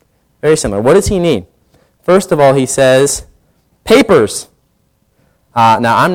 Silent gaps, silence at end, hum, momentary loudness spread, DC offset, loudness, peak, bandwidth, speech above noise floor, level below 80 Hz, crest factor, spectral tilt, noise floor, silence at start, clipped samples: none; 0 s; none; 11 LU; under 0.1%; -11 LUFS; 0 dBFS; 17 kHz; 48 dB; -36 dBFS; 12 dB; -4.5 dB/octave; -58 dBFS; 0.45 s; under 0.1%